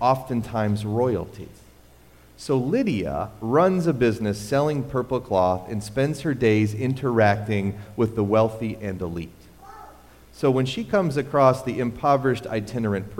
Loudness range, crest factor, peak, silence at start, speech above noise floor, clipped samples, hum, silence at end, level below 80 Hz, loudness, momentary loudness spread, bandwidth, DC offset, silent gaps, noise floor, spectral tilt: 3 LU; 20 dB; -4 dBFS; 0 s; 28 dB; under 0.1%; none; 0 s; -50 dBFS; -23 LUFS; 10 LU; 16.5 kHz; under 0.1%; none; -51 dBFS; -7 dB/octave